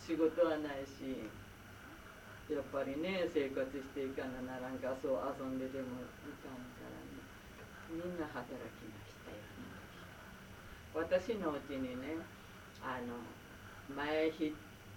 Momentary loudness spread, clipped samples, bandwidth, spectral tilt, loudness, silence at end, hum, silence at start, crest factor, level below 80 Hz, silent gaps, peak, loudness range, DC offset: 18 LU; under 0.1%; 19 kHz; -6 dB/octave; -41 LUFS; 0 s; none; 0 s; 20 dB; -64 dBFS; none; -22 dBFS; 8 LU; under 0.1%